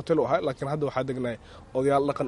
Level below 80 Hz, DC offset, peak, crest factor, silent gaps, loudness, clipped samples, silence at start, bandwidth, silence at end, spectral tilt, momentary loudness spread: -54 dBFS; under 0.1%; -10 dBFS; 16 dB; none; -27 LUFS; under 0.1%; 0 s; 11.5 kHz; 0 s; -7 dB/octave; 10 LU